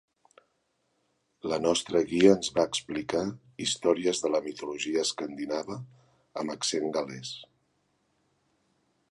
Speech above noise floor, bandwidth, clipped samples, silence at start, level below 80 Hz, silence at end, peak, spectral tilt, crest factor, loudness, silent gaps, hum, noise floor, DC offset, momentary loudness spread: 47 dB; 11.5 kHz; under 0.1%; 1.45 s; -66 dBFS; 1.65 s; -6 dBFS; -3.5 dB/octave; 24 dB; -28 LUFS; none; none; -75 dBFS; under 0.1%; 17 LU